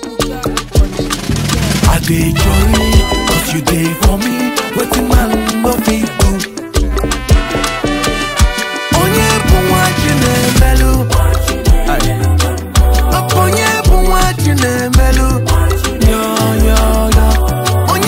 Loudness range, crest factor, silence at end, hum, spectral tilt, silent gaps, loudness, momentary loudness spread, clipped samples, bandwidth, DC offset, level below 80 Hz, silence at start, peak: 2 LU; 10 dB; 0 s; none; -4.5 dB/octave; none; -12 LUFS; 5 LU; under 0.1%; 16.5 kHz; under 0.1%; -14 dBFS; 0 s; 0 dBFS